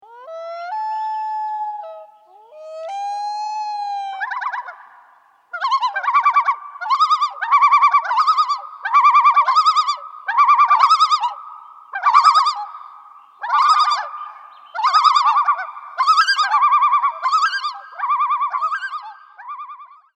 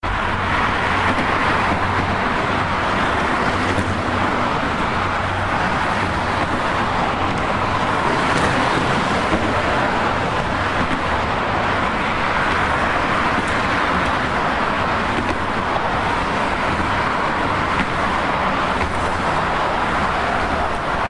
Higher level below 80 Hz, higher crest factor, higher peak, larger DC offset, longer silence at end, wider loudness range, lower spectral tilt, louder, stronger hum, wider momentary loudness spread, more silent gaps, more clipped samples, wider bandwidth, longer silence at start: second, under -90 dBFS vs -34 dBFS; about the same, 18 dB vs 16 dB; about the same, 0 dBFS vs -2 dBFS; neither; first, 0.35 s vs 0 s; first, 12 LU vs 1 LU; second, 5 dB/octave vs -5 dB/octave; first, -16 LUFS vs -19 LUFS; neither; first, 20 LU vs 2 LU; neither; neither; second, 9.6 kHz vs 11.5 kHz; about the same, 0.1 s vs 0.05 s